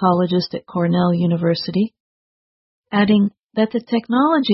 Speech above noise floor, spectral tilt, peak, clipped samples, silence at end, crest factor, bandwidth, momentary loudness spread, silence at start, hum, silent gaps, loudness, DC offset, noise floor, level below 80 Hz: over 73 dB; -10 dB/octave; -4 dBFS; under 0.1%; 0 s; 14 dB; 6 kHz; 6 LU; 0 s; none; 2.00-2.83 s, 3.44-3.49 s; -19 LUFS; under 0.1%; under -90 dBFS; -58 dBFS